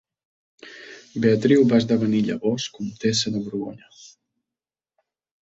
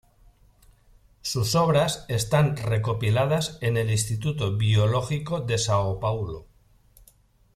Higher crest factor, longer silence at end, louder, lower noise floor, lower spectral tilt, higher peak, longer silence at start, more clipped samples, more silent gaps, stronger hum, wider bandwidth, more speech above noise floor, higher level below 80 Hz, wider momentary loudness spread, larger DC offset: about the same, 18 dB vs 16 dB; first, 1.35 s vs 1.15 s; first, -21 LUFS vs -25 LUFS; first, under -90 dBFS vs -59 dBFS; about the same, -5.5 dB/octave vs -5 dB/octave; about the same, -6 dBFS vs -8 dBFS; second, 0.65 s vs 1.25 s; neither; neither; neither; second, 8 kHz vs 15 kHz; first, over 69 dB vs 35 dB; second, -62 dBFS vs -50 dBFS; first, 18 LU vs 7 LU; neither